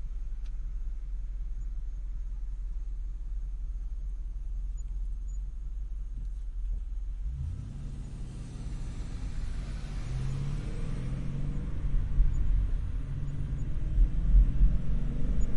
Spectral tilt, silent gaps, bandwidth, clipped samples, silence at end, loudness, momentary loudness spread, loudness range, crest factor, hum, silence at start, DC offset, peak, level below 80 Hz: -7.5 dB/octave; none; 7.4 kHz; under 0.1%; 0 s; -36 LUFS; 11 LU; 9 LU; 18 dB; none; 0 s; under 0.1%; -12 dBFS; -30 dBFS